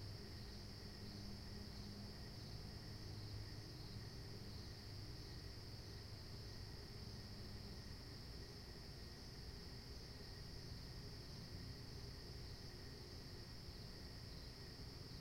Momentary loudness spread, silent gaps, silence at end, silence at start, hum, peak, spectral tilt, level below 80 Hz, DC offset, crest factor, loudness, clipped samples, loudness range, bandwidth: 2 LU; none; 0 s; 0 s; none; -40 dBFS; -5 dB/octave; -60 dBFS; under 0.1%; 14 dB; -54 LUFS; under 0.1%; 1 LU; 16.5 kHz